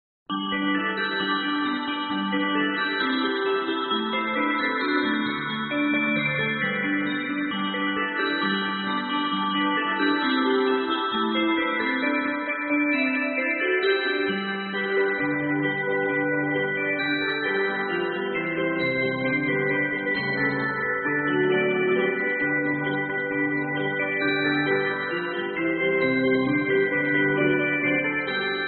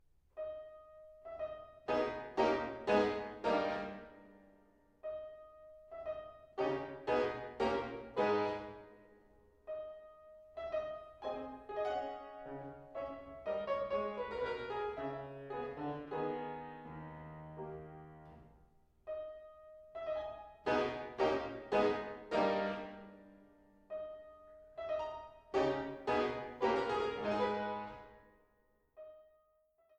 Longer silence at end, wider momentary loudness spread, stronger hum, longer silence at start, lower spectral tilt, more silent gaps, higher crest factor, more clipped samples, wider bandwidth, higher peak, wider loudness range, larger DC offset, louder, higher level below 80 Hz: second, 0 s vs 0.75 s; second, 4 LU vs 21 LU; neither; about the same, 0.3 s vs 0.35 s; second, -2.5 dB/octave vs -6 dB/octave; neither; second, 14 dB vs 22 dB; neither; second, 4.6 kHz vs 8.8 kHz; first, -10 dBFS vs -18 dBFS; second, 2 LU vs 8 LU; neither; first, -24 LUFS vs -39 LUFS; about the same, -66 dBFS vs -66 dBFS